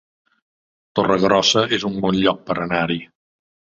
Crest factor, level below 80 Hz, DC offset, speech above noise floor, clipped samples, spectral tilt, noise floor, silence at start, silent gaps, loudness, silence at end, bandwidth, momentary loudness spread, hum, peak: 20 dB; -52 dBFS; under 0.1%; over 72 dB; under 0.1%; -4 dB/octave; under -90 dBFS; 0.95 s; none; -19 LUFS; 0.75 s; 7.6 kHz; 9 LU; none; -2 dBFS